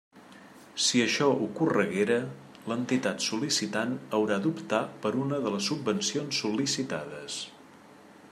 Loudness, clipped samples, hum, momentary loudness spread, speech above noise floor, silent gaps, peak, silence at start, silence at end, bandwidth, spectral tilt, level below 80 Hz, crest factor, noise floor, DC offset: -28 LUFS; under 0.1%; none; 11 LU; 24 dB; none; -10 dBFS; 0.15 s; 0.05 s; 14.5 kHz; -3.5 dB/octave; -74 dBFS; 20 dB; -52 dBFS; under 0.1%